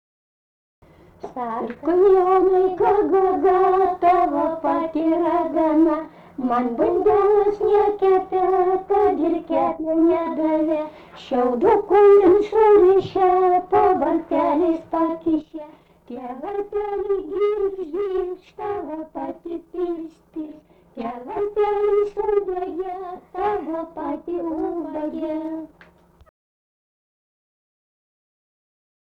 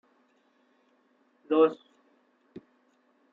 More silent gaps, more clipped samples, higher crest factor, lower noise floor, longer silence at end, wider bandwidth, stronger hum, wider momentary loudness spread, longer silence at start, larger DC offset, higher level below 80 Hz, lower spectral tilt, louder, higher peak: neither; neither; second, 14 dB vs 22 dB; second, -52 dBFS vs -68 dBFS; first, 3.4 s vs 1.6 s; first, 4.9 kHz vs 4.3 kHz; neither; second, 16 LU vs 28 LU; second, 1.25 s vs 1.5 s; neither; first, -52 dBFS vs -88 dBFS; first, -8 dB/octave vs -4.5 dB/octave; first, -20 LUFS vs -25 LUFS; first, -6 dBFS vs -10 dBFS